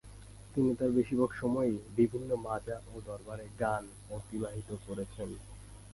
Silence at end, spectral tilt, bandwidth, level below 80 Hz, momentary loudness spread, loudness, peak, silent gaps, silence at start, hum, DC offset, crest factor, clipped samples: 0 s; -7.5 dB/octave; 11.5 kHz; -54 dBFS; 15 LU; -35 LUFS; -16 dBFS; none; 0.05 s; none; under 0.1%; 18 dB; under 0.1%